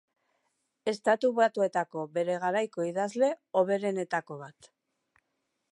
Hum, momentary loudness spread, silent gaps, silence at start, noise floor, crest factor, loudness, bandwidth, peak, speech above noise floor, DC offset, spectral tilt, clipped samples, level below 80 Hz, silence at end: none; 9 LU; none; 0.85 s; -81 dBFS; 20 dB; -29 LUFS; 11.5 kHz; -12 dBFS; 52 dB; under 0.1%; -5.5 dB/octave; under 0.1%; -86 dBFS; 1.2 s